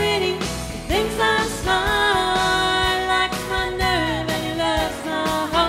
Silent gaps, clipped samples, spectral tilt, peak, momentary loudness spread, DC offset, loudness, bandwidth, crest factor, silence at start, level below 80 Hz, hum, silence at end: none; under 0.1%; -3.5 dB/octave; -6 dBFS; 6 LU; under 0.1%; -20 LUFS; 16 kHz; 16 dB; 0 s; -36 dBFS; none; 0 s